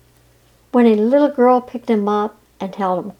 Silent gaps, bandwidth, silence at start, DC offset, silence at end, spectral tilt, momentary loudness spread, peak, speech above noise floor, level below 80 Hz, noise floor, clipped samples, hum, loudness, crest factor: none; 9.2 kHz; 0.75 s; under 0.1%; 0.1 s; -8 dB/octave; 12 LU; -2 dBFS; 38 dB; -60 dBFS; -53 dBFS; under 0.1%; none; -16 LUFS; 14 dB